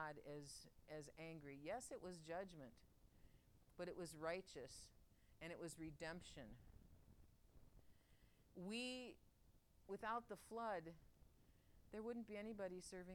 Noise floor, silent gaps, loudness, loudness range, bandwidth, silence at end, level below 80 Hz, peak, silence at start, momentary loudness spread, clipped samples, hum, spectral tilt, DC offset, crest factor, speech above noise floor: -74 dBFS; none; -54 LUFS; 6 LU; 19 kHz; 0 s; -74 dBFS; -36 dBFS; 0 s; 13 LU; under 0.1%; none; -4.5 dB/octave; under 0.1%; 20 dB; 20 dB